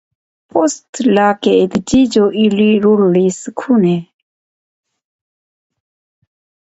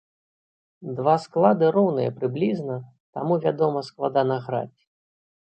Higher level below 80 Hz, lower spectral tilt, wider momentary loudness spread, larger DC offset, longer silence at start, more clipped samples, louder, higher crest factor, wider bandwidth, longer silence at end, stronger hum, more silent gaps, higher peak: first, -50 dBFS vs -70 dBFS; second, -6 dB/octave vs -8.5 dB/octave; second, 7 LU vs 15 LU; neither; second, 0.55 s vs 0.8 s; neither; first, -13 LUFS vs -23 LUFS; second, 14 dB vs 20 dB; about the same, 8.2 kHz vs 8.8 kHz; first, 2.6 s vs 0.8 s; neither; second, 0.89-0.93 s vs 3.00-3.13 s; first, 0 dBFS vs -4 dBFS